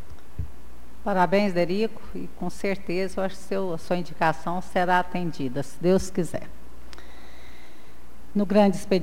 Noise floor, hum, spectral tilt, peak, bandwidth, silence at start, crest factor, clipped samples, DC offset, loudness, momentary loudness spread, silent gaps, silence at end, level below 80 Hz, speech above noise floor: -50 dBFS; none; -6 dB/octave; -8 dBFS; 16 kHz; 0.1 s; 18 dB; under 0.1%; 4%; -26 LUFS; 17 LU; none; 0 s; -48 dBFS; 25 dB